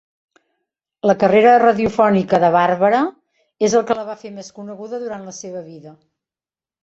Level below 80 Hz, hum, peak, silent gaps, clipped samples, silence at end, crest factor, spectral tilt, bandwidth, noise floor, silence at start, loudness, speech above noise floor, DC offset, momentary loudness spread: -56 dBFS; none; -2 dBFS; none; under 0.1%; 0.9 s; 16 dB; -5.5 dB/octave; 8 kHz; under -90 dBFS; 1.05 s; -15 LUFS; over 74 dB; under 0.1%; 21 LU